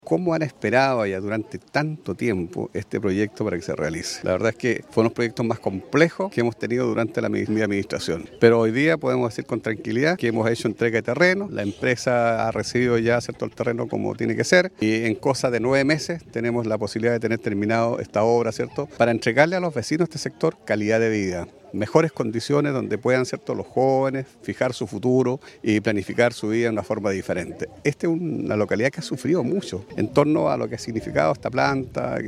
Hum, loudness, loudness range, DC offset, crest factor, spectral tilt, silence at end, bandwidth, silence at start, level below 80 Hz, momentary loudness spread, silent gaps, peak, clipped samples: none; -23 LUFS; 3 LU; under 0.1%; 22 dB; -6 dB/octave; 0 s; 13.5 kHz; 0.05 s; -56 dBFS; 8 LU; none; 0 dBFS; under 0.1%